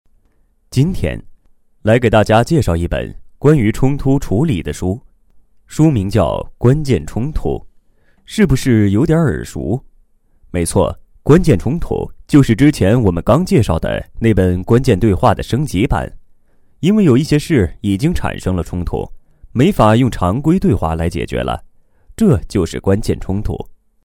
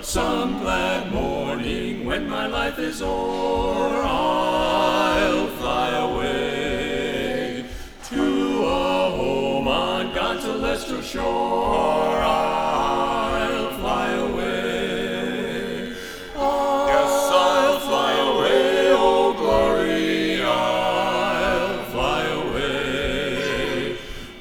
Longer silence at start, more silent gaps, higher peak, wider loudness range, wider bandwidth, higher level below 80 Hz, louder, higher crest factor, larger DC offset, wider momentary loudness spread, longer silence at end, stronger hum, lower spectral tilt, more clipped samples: first, 0.7 s vs 0 s; neither; first, 0 dBFS vs -4 dBFS; about the same, 4 LU vs 6 LU; second, 16.5 kHz vs over 20 kHz; first, -28 dBFS vs -38 dBFS; first, -15 LUFS vs -22 LUFS; about the same, 14 dB vs 16 dB; second, under 0.1% vs 0.2%; first, 11 LU vs 8 LU; first, 0.3 s vs 0 s; neither; first, -7 dB/octave vs -4 dB/octave; neither